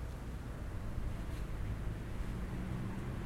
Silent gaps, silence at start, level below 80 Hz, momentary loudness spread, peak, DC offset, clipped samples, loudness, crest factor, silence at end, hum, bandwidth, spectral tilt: none; 0 s; -42 dBFS; 4 LU; -26 dBFS; under 0.1%; under 0.1%; -43 LUFS; 14 dB; 0 s; none; 16 kHz; -7 dB/octave